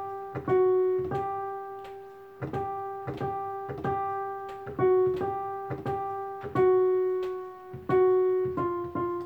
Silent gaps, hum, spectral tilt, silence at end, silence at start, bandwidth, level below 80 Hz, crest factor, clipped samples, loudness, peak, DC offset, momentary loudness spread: none; none; -9.5 dB/octave; 0 s; 0 s; 4.4 kHz; -60 dBFS; 14 dB; under 0.1%; -29 LUFS; -14 dBFS; under 0.1%; 15 LU